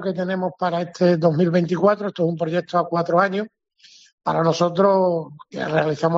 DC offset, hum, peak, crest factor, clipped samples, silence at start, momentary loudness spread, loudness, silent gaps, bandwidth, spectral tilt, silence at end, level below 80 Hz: under 0.1%; none; -4 dBFS; 16 dB; under 0.1%; 0 s; 9 LU; -20 LUFS; 4.13-4.18 s; 7.6 kHz; -6 dB/octave; 0 s; -66 dBFS